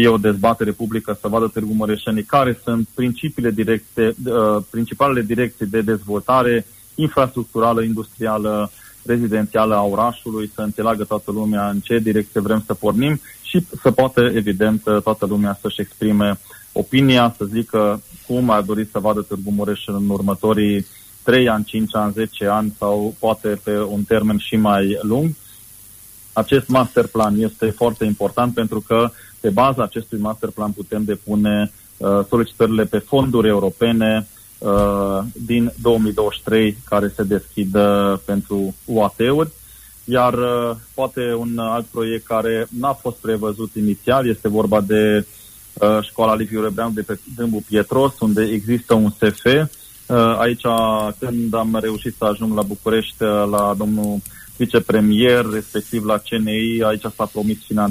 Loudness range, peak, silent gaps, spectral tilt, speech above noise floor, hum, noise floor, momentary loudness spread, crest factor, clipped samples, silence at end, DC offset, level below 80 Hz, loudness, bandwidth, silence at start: 2 LU; -4 dBFS; none; -6 dB/octave; 24 dB; none; -42 dBFS; 8 LU; 14 dB; under 0.1%; 0 s; under 0.1%; -44 dBFS; -18 LUFS; 15.5 kHz; 0 s